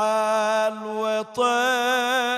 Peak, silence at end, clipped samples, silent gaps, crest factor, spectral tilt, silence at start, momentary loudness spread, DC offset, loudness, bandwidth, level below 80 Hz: -10 dBFS; 0 s; under 0.1%; none; 12 dB; -2 dB/octave; 0 s; 5 LU; under 0.1%; -22 LUFS; 15 kHz; -74 dBFS